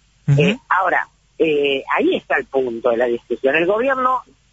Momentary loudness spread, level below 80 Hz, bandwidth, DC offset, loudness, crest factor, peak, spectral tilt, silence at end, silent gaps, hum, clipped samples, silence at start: 5 LU; -54 dBFS; 8 kHz; under 0.1%; -18 LUFS; 14 dB; -4 dBFS; -7 dB/octave; 0.3 s; none; none; under 0.1%; 0.25 s